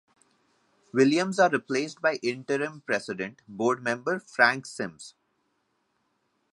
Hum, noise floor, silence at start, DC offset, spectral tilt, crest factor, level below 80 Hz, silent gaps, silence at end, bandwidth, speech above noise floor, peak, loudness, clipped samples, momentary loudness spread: none; -74 dBFS; 0.95 s; under 0.1%; -4.5 dB/octave; 24 dB; -76 dBFS; none; 1.45 s; 11.5 kHz; 48 dB; -4 dBFS; -27 LUFS; under 0.1%; 13 LU